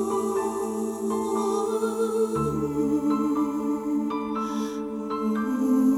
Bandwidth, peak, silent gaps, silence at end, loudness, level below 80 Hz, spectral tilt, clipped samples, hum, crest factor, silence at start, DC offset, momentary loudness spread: 17 kHz; -12 dBFS; none; 0 s; -26 LUFS; -54 dBFS; -6.5 dB/octave; under 0.1%; none; 12 dB; 0 s; under 0.1%; 5 LU